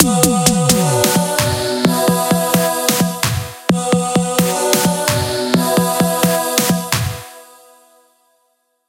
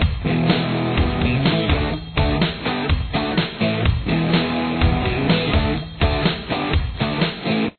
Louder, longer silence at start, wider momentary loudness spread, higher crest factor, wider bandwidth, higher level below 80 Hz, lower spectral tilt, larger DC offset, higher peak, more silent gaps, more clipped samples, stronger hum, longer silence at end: first, -15 LUFS vs -20 LUFS; about the same, 0 s vs 0 s; first, 6 LU vs 3 LU; about the same, 16 dB vs 14 dB; first, 17.5 kHz vs 4.6 kHz; second, -42 dBFS vs -28 dBFS; second, -4 dB/octave vs -9.5 dB/octave; neither; first, 0 dBFS vs -4 dBFS; neither; neither; neither; first, 1.45 s vs 0.1 s